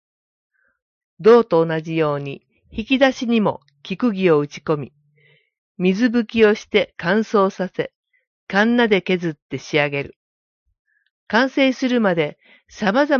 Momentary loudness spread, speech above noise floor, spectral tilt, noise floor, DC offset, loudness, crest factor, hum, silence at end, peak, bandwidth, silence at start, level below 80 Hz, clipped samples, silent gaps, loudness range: 13 LU; 40 dB; -6 dB/octave; -58 dBFS; under 0.1%; -19 LUFS; 18 dB; none; 0 s; -2 dBFS; 7 kHz; 1.2 s; -56 dBFS; under 0.1%; 5.58-5.75 s, 7.96-8.03 s, 8.27-8.47 s, 9.42-9.49 s, 10.16-10.66 s, 10.79-10.85 s, 11.11-11.27 s; 3 LU